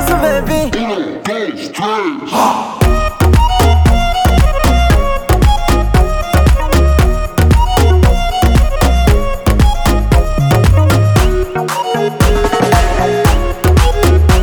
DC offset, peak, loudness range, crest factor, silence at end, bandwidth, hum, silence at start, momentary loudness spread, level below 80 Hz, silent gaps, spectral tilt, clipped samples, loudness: under 0.1%; 0 dBFS; 2 LU; 10 dB; 0 s; 19.5 kHz; none; 0 s; 6 LU; -14 dBFS; none; -6 dB/octave; under 0.1%; -12 LUFS